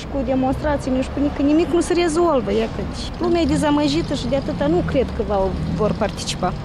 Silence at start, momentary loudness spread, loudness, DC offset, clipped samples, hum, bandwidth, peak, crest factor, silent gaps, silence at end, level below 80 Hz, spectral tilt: 0 s; 5 LU; -20 LUFS; under 0.1%; under 0.1%; none; 12.5 kHz; -8 dBFS; 12 dB; none; 0 s; -32 dBFS; -6 dB/octave